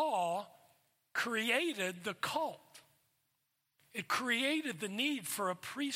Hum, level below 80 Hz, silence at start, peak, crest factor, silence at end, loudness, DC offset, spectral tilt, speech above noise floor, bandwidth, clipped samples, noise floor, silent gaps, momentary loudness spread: none; -86 dBFS; 0 s; -18 dBFS; 20 dB; 0 s; -36 LUFS; under 0.1%; -2.5 dB/octave; 46 dB; 16.5 kHz; under 0.1%; -82 dBFS; none; 10 LU